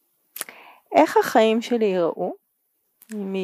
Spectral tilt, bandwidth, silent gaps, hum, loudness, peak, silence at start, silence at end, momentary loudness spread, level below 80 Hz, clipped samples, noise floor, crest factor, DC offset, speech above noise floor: -5 dB/octave; 15.5 kHz; none; none; -21 LUFS; -4 dBFS; 0.35 s; 0 s; 18 LU; -76 dBFS; under 0.1%; -71 dBFS; 18 dB; under 0.1%; 51 dB